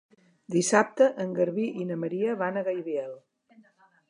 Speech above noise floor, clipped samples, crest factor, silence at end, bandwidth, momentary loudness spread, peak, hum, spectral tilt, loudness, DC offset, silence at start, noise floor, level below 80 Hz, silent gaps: 34 dB; under 0.1%; 22 dB; 0.9 s; 11.5 kHz; 10 LU; -6 dBFS; none; -5 dB/octave; -27 LUFS; under 0.1%; 0.5 s; -61 dBFS; -82 dBFS; none